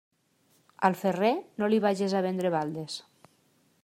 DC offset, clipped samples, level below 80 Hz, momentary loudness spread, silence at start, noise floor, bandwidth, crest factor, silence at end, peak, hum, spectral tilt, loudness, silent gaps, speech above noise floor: under 0.1%; under 0.1%; -76 dBFS; 10 LU; 0.8 s; -68 dBFS; 15.5 kHz; 22 dB; 0.85 s; -8 dBFS; none; -6 dB/octave; -28 LUFS; none; 41 dB